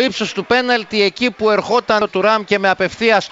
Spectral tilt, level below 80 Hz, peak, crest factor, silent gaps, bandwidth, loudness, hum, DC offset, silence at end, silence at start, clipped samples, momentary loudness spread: -4 dB/octave; -52 dBFS; -2 dBFS; 14 dB; none; 8 kHz; -15 LUFS; none; under 0.1%; 0.05 s; 0 s; under 0.1%; 2 LU